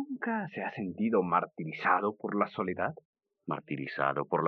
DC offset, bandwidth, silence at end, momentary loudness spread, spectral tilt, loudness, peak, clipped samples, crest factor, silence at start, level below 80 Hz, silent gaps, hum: under 0.1%; 6 kHz; 0 s; 10 LU; -9 dB/octave; -32 LUFS; -12 dBFS; under 0.1%; 20 dB; 0 s; -80 dBFS; 3.05-3.13 s; none